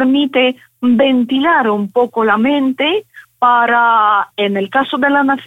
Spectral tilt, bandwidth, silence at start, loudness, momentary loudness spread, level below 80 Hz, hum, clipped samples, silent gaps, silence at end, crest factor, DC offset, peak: -6.5 dB/octave; 4 kHz; 0 s; -13 LUFS; 6 LU; -60 dBFS; none; under 0.1%; none; 0 s; 12 dB; under 0.1%; 0 dBFS